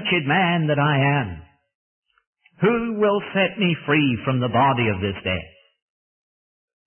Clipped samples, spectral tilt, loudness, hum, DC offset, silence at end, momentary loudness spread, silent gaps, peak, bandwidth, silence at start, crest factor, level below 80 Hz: under 0.1%; -11 dB/octave; -20 LUFS; none; under 0.1%; 1.4 s; 7 LU; 1.75-2.02 s, 2.27-2.33 s; -6 dBFS; 3.4 kHz; 0 s; 16 dB; -54 dBFS